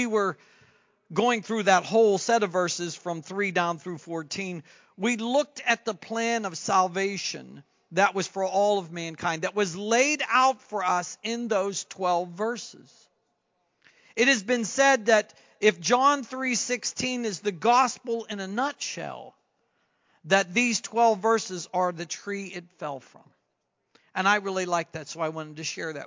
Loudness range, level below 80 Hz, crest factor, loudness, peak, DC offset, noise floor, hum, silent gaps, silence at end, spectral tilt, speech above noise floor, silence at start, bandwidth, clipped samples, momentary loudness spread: 6 LU; -74 dBFS; 22 dB; -26 LUFS; -6 dBFS; under 0.1%; -77 dBFS; none; none; 0 s; -3 dB/octave; 51 dB; 0 s; 7.8 kHz; under 0.1%; 13 LU